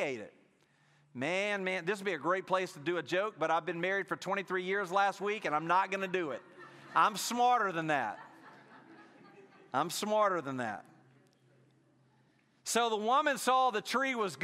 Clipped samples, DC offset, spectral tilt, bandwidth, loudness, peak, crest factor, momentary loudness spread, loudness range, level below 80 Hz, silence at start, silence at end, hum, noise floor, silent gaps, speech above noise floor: under 0.1%; under 0.1%; -3.5 dB/octave; 15.5 kHz; -32 LUFS; -14 dBFS; 20 dB; 11 LU; 5 LU; -88 dBFS; 0 s; 0 s; none; -69 dBFS; none; 37 dB